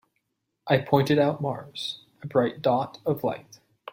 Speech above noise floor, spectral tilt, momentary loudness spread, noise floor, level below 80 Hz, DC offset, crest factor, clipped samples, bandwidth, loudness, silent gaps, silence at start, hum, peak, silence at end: 53 dB; -6.5 dB/octave; 16 LU; -78 dBFS; -66 dBFS; under 0.1%; 22 dB; under 0.1%; 16.5 kHz; -26 LUFS; none; 0.65 s; none; -6 dBFS; 0 s